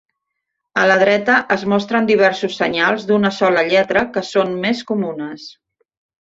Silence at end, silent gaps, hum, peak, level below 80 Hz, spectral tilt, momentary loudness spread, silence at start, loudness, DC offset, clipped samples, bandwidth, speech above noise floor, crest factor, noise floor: 0.7 s; none; none; -2 dBFS; -58 dBFS; -5 dB/octave; 9 LU; 0.75 s; -16 LUFS; under 0.1%; under 0.1%; 8 kHz; 61 dB; 16 dB; -77 dBFS